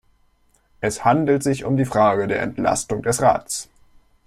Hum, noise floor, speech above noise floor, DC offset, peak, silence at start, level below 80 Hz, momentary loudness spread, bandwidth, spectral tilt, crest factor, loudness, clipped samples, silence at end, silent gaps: none; -60 dBFS; 41 dB; under 0.1%; -4 dBFS; 0.8 s; -50 dBFS; 9 LU; 15.5 kHz; -5 dB/octave; 18 dB; -20 LUFS; under 0.1%; 0.65 s; none